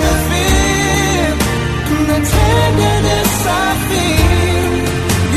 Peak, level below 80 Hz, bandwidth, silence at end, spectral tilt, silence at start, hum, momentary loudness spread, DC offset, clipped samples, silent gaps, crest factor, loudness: 0 dBFS; -20 dBFS; 14 kHz; 0 s; -4.5 dB/octave; 0 s; none; 4 LU; under 0.1%; under 0.1%; none; 12 dB; -13 LUFS